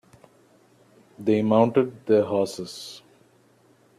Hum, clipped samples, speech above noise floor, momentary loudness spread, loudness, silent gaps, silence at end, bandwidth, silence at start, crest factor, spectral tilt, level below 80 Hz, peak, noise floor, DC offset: none; under 0.1%; 37 dB; 18 LU; -23 LUFS; none; 1 s; 13.5 kHz; 1.2 s; 20 dB; -6.5 dB/octave; -68 dBFS; -6 dBFS; -59 dBFS; under 0.1%